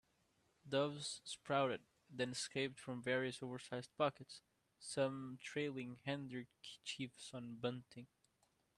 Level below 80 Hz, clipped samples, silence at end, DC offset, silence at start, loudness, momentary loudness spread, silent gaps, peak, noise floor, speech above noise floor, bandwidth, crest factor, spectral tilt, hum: -82 dBFS; under 0.1%; 0.75 s; under 0.1%; 0.65 s; -44 LUFS; 14 LU; none; -24 dBFS; -81 dBFS; 37 dB; 12.5 kHz; 22 dB; -4.5 dB/octave; none